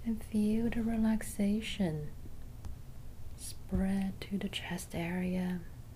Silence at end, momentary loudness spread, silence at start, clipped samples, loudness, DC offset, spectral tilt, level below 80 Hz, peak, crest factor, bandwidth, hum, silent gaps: 0 s; 18 LU; 0 s; under 0.1%; -35 LUFS; under 0.1%; -6 dB/octave; -46 dBFS; -20 dBFS; 14 dB; 15.5 kHz; none; none